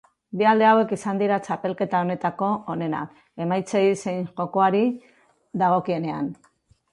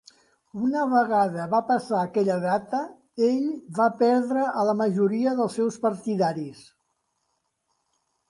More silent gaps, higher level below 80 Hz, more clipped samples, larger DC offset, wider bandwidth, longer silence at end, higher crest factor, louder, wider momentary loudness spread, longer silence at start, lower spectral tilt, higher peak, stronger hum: neither; about the same, -68 dBFS vs -72 dBFS; neither; neither; about the same, 11.5 kHz vs 11.5 kHz; second, 0.6 s vs 1.7 s; about the same, 16 dB vs 16 dB; about the same, -23 LUFS vs -24 LUFS; first, 13 LU vs 8 LU; second, 0.35 s vs 0.55 s; about the same, -6.5 dB/octave vs -7 dB/octave; first, -6 dBFS vs -10 dBFS; neither